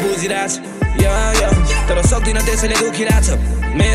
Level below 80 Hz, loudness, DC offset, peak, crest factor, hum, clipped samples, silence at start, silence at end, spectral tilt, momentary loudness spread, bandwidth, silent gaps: -18 dBFS; -16 LUFS; under 0.1%; -2 dBFS; 12 dB; none; under 0.1%; 0 s; 0 s; -4.5 dB/octave; 5 LU; 14.5 kHz; none